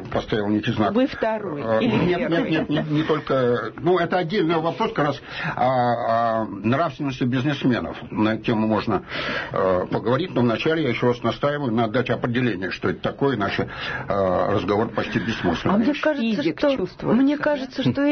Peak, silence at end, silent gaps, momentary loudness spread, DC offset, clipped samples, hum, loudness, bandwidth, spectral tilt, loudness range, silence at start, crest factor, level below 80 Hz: -8 dBFS; 0 s; none; 5 LU; under 0.1%; under 0.1%; none; -22 LUFS; 6.4 kHz; -7.5 dB/octave; 2 LU; 0 s; 12 dB; -50 dBFS